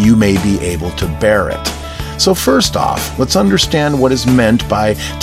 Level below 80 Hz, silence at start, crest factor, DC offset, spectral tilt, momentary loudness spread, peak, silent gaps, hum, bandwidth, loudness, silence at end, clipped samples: -28 dBFS; 0 s; 12 dB; under 0.1%; -5 dB/octave; 8 LU; 0 dBFS; none; none; 16.5 kHz; -13 LUFS; 0 s; under 0.1%